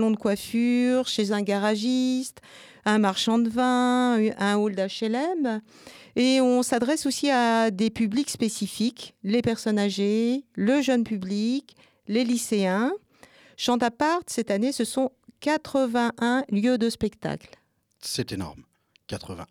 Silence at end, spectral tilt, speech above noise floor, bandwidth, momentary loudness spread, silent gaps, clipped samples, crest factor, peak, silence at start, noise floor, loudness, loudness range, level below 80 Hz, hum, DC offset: 0.05 s; -4.5 dB/octave; 30 dB; 15.5 kHz; 10 LU; none; under 0.1%; 16 dB; -10 dBFS; 0 s; -54 dBFS; -25 LUFS; 3 LU; -62 dBFS; none; under 0.1%